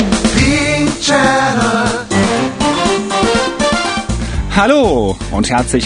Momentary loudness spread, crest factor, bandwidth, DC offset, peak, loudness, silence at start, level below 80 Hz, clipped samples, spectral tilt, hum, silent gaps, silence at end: 6 LU; 12 dB; 10.5 kHz; under 0.1%; 0 dBFS; -13 LUFS; 0 s; -26 dBFS; under 0.1%; -4 dB/octave; none; none; 0 s